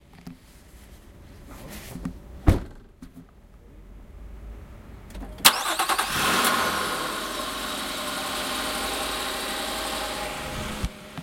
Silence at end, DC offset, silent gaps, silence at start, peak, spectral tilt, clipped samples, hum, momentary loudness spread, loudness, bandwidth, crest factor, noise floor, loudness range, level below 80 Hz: 0 s; under 0.1%; none; 0.1 s; 0 dBFS; -2.5 dB/octave; under 0.1%; none; 25 LU; -25 LUFS; 16.5 kHz; 28 dB; -50 dBFS; 10 LU; -40 dBFS